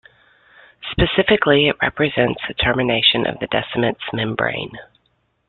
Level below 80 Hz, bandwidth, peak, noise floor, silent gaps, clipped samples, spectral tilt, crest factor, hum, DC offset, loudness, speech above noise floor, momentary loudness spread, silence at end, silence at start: -40 dBFS; 4.4 kHz; -2 dBFS; -65 dBFS; none; under 0.1%; -9.5 dB/octave; 18 dB; none; under 0.1%; -18 LUFS; 47 dB; 9 LU; 0.65 s; 0.8 s